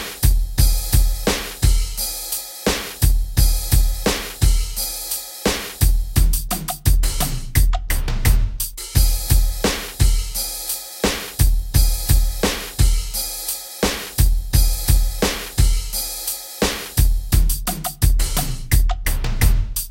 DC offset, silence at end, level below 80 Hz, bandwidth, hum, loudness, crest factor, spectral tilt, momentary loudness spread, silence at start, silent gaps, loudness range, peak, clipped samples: under 0.1%; 0 s; -20 dBFS; 17 kHz; none; -20 LUFS; 14 dB; -3.5 dB/octave; 5 LU; 0 s; none; 1 LU; -2 dBFS; under 0.1%